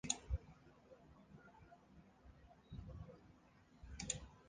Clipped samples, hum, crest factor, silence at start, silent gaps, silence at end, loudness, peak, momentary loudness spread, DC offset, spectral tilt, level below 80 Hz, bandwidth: under 0.1%; none; 32 dB; 0.05 s; none; 0 s; -49 LUFS; -22 dBFS; 20 LU; under 0.1%; -3 dB/octave; -56 dBFS; 9.6 kHz